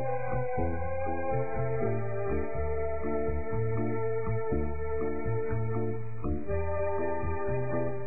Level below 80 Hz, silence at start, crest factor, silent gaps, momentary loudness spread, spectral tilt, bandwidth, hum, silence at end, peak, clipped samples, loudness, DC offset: -42 dBFS; 0 s; 12 dB; none; 2 LU; -14 dB/octave; 2.6 kHz; none; 0 s; -18 dBFS; under 0.1%; -33 LUFS; 3%